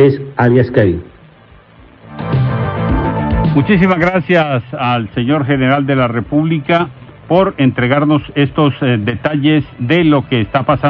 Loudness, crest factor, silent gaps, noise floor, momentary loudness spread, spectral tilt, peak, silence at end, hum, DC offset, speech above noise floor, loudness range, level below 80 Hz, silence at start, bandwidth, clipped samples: -13 LUFS; 12 dB; none; -42 dBFS; 5 LU; -9.5 dB/octave; 0 dBFS; 0 s; none; under 0.1%; 30 dB; 3 LU; -32 dBFS; 0 s; 5.8 kHz; under 0.1%